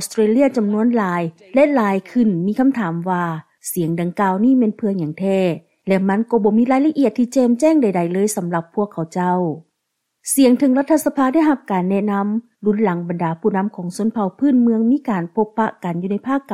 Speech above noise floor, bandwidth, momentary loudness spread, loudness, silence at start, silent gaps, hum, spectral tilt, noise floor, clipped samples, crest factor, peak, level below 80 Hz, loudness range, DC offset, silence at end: 58 dB; 15.5 kHz; 8 LU; -18 LUFS; 0 s; none; none; -6.5 dB/octave; -75 dBFS; under 0.1%; 14 dB; -4 dBFS; -62 dBFS; 2 LU; under 0.1%; 0 s